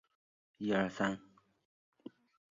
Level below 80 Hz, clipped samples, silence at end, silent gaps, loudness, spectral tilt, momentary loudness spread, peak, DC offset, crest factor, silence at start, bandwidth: -72 dBFS; under 0.1%; 1.3 s; none; -36 LUFS; -4.5 dB/octave; 22 LU; -20 dBFS; under 0.1%; 22 dB; 0.6 s; 7.4 kHz